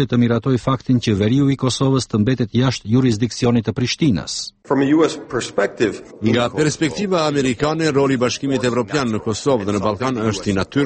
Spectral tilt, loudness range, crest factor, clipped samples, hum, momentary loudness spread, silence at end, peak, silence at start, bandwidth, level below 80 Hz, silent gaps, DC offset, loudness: -6 dB/octave; 1 LU; 14 dB; under 0.1%; none; 5 LU; 0 s; -4 dBFS; 0 s; 8.8 kHz; -46 dBFS; none; under 0.1%; -18 LUFS